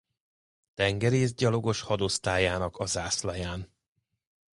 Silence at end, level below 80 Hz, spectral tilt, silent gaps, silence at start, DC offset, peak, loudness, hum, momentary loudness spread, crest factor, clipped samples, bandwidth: 0.9 s; -48 dBFS; -4.5 dB/octave; none; 0.8 s; under 0.1%; -10 dBFS; -28 LUFS; none; 11 LU; 20 dB; under 0.1%; 11.5 kHz